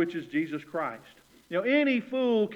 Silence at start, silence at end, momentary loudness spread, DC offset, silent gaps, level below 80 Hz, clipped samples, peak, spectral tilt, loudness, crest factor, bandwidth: 0 s; 0 s; 9 LU; under 0.1%; none; -74 dBFS; under 0.1%; -14 dBFS; -6.5 dB/octave; -29 LUFS; 14 dB; 11 kHz